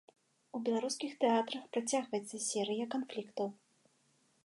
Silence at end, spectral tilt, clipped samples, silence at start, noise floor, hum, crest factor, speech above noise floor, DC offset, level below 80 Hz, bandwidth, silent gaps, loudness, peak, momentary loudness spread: 0.9 s; -3 dB/octave; under 0.1%; 0.55 s; -73 dBFS; none; 20 dB; 37 dB; under 0.1%; under -90 dBFS; 11.5 kHz; none; -36 LUFS; -18 dBFS; 9 LU